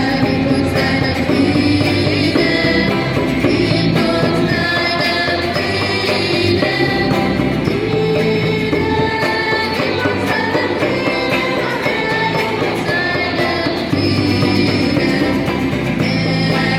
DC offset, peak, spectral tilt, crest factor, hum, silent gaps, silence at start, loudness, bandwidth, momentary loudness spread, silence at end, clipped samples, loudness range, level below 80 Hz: under 0.1%; -2 dBFS; -6 dB/octave; 14 dB; none; none; 0 s; -15 LUFS; 16.5 kHz; 3 LU; 0 s; under 0.1%; 2 LU; -38 dBFS